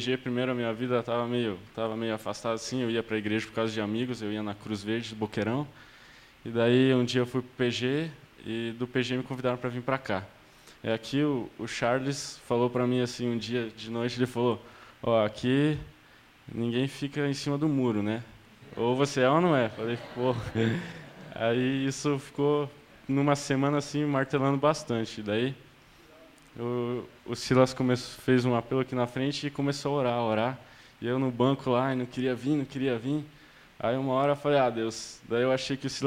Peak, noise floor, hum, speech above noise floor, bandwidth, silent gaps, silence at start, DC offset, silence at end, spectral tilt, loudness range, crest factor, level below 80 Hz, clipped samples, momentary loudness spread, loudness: -10 dBFS; -57 dBFS; none; 28 dB; 15 kHz; none; 0 s; under 0.1%; 0 s; -6 dB/octave; 4 LU; 20 dB; -60 dBFS; under 0.1%; 10 LU; -29 LUFS